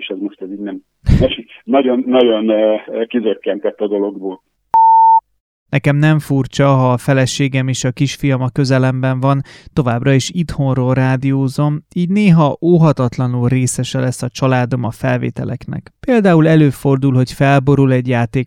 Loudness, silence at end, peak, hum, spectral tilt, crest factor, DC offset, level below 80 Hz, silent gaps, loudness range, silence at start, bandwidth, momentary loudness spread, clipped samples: -14 LUFS; 0 s; 0 dBFS; none; -6.5 dB/octave; 14 dB; under 0.1%; -34 dBFS; 5.40-5.66 s; 3 LU; 0 s; 13.5 kHz; 10 LU; under 0.1%